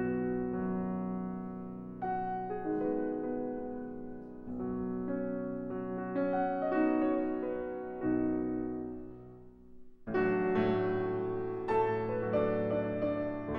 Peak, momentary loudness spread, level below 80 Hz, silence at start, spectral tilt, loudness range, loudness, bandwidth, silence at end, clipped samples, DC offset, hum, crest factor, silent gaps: -18 dBFS; 12 LU; -58 dBFS; 0 s; -10 dB/octave; 5 LU; -34 LUFS; 5.4 kHz; 0 s; under 0.1%; under 0.1%; none; 16 dB; none